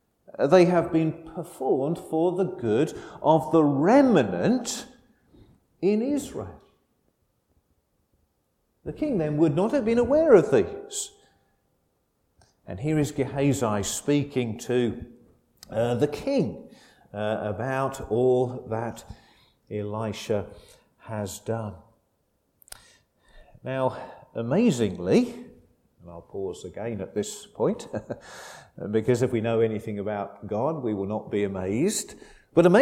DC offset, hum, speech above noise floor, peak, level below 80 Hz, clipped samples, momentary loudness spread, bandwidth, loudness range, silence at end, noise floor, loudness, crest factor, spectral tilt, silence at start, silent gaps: under 0.1%; none; 48 dB; -4 dBFS; -56 dBFS; under 0.1%; 18 LU; 16 kHz; 11 LU; 0 s; -72 dBFS; -25 LUFS; 22 dB; -6 dB/octave; 0.4 s; none